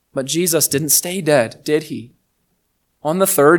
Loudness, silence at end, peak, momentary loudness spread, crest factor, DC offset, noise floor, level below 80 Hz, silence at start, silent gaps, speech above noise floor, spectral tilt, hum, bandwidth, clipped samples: -16 LUFS; 0 s; 0 dBFS; 12 LU; 18 dB; under 0.1%; -67 dBFS; -62 dBFS; 0.15 s; none; 51 dB; -3.5 dB/octave; none; 19.5 kHz; under 0.1%